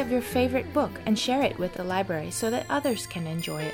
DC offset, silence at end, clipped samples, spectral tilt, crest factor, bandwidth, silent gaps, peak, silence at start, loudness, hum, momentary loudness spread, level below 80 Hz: under 0.1%; 0 s; under 0.1%; -4.5 dB/octave; 16 dB; over 20 kHz; none; -10 dBFS; 0 s; -27 LUFS; none; 6 LU; -52 dBFS